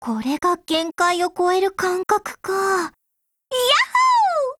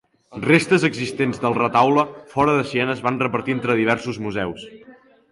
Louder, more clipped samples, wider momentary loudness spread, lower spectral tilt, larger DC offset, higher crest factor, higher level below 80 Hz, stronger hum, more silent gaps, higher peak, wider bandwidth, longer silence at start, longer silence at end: about the same, -19 LUFS vs -20 LUFS; neither; second, 8 LU vs 11 LU; second, -2 dB/octave vs -6 dB/octave; neither; about the same, 16 dB vs 18 dB; about the same, -60 dBFS vs -56 dBFS; neither; neither; about the same, -4 dBFS vs -2 dBFS; first, 17.5 kHz vs 11.5 kHz; second, 0 s vs 0.3 s; second, 0.05 s vs 0.4 s